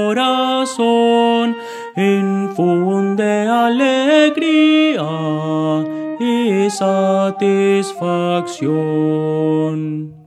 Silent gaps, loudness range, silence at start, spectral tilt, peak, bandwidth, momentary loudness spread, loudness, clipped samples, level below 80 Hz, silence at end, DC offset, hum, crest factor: none; 2 LU; 0 s; -6 dB/octave; -2 dBFS; 13 kHz; 7 LU; -16 LUFS; under 0.1%; -70 dBFS; 0.05 s; under 0.1%; none; 14 dB